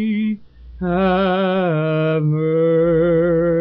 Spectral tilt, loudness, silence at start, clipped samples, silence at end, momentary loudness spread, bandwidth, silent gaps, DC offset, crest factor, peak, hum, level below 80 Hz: -7 dB/octave; -17 LUFS; 0 s; under 0.1%; 0 s; 7 LU; 5.4 kHz; none; under 0.1%; 8 dB; -8 dBFS; none; -42 dBFS